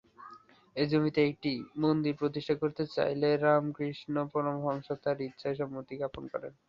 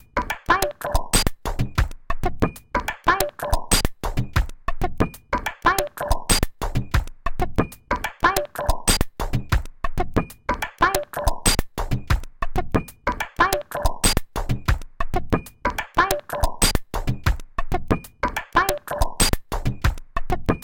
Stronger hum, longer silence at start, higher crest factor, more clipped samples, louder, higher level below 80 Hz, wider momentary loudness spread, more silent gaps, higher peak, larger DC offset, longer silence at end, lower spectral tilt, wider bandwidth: neither; about the same, 0.2 s vs 0.15 s; about the same, 20 dB vs 18 dB; neither; second, -32 LUFS vs -24 LUFS; second, -66 dBFS vs -28 dBFS; first, 11 LU vs 8 LU; neither; second, -12 dBFS vs -4 dBFS; neither; first, 0.15 s vs 0 s; first, -8.5 dB/octave vs -3.5 dB/octave; second, 7.2 kHz vs 17 kHz